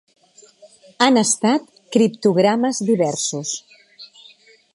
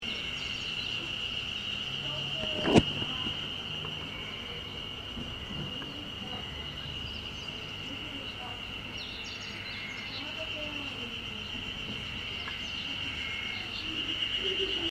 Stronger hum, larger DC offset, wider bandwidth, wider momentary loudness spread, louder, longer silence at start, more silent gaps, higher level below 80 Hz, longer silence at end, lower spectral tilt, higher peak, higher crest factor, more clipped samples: neither; neither; second, 11.5 kHz vs 15.5 kHz; about the same, 8 LU vs 8 LU; first, -18 LUFS vs -34 LUFS; first, 1 s vs 0 s; neither; second, -72 dBFS vs -52 dBFS; first, 0.7 s vs 0 s; about the same, -4 dB/octave vs -4 dB/octave; first, 0 dBFS vs -6 dBFS; second, 20 dB vs 30 dB; neither